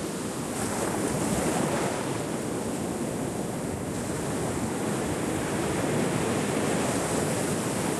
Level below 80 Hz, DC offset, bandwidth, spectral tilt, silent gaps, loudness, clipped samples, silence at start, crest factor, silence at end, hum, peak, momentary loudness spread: -50 dBFS; under 0.1%; 13 kHz; -4.5 dB/octave; none; -29 LUFS; under 0.1%; 0 s; 14 dB; 0 s; none; -14 dBFS; 5 LU